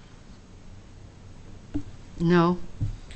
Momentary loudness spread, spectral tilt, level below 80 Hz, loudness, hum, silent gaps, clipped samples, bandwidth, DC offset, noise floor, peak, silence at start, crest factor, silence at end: 27 LU; -8 dB/octave; -42 dBFS; -26 LUFS; none; none; under 0.1%; 8.2 kHz; under 0.1%; -47 dBFS; -10 dBFS; 0 s; 18 dB; 0 s